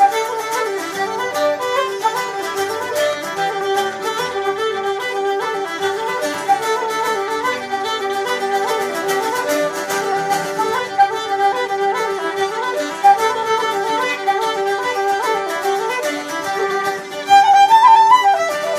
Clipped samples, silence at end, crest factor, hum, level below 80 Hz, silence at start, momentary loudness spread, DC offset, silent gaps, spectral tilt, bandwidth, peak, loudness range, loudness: under 0.1%; 0 s; 16 dB; none; -66 dBFS; 0 s; 9 LU; under 0.1%; none; -2 dB/octave; 15.5 kHz; 0 dBFS; 5 LU; -17 LUFS